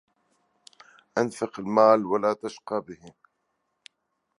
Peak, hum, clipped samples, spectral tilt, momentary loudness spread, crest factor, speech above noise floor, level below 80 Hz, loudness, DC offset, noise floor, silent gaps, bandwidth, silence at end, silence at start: -6 dBFS; none; under 0.1%; -6 dB/octave; 14 LU; 22 dB; 53 dB; -72 dBFS; -25 LUFS; under 0.1%; -78 dBFS; none; 11.5 kHz; 1.3 s; 1.15 s